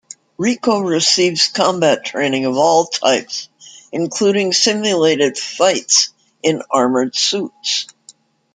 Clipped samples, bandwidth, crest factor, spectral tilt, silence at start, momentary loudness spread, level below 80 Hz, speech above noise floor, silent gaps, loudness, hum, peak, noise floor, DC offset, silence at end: under 0.1%; 11 kHz; 16 dB; -2.5 dB/octave; 0.4 s; 8 LU; -64 dBFS; 32 dB; none; -15 LUFS; none; 0 dBFS; -48 dBFS; under 0.1%; 0.7 s